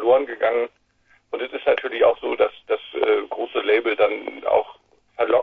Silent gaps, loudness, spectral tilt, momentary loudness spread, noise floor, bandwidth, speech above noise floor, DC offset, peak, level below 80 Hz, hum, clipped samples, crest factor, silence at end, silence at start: none; -22 LUFS; -6 dB/octave; 11 LU; -61 dBFS; 4.4 kHz; 39 dB; under 0.1%; -4 dBFS; -62 dBFS; none; under 0.1%; 18 dB; 0 s; 0 s